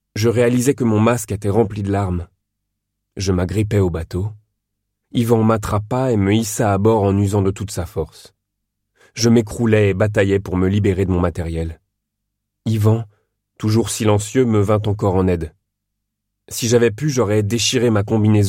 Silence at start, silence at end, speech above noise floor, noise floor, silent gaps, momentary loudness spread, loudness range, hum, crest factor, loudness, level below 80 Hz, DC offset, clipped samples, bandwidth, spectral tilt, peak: 0.15 s; 0 s; 60 dB; -77 dBFS; none; 10 LU; 3 LU; 50 Hz at -40 dBFS; 16 dB; -18 LUFS; -40 dBFS; under 0.1%; under 0.1%; 16.5 kHz; -6 dB/octave; -2 dBFS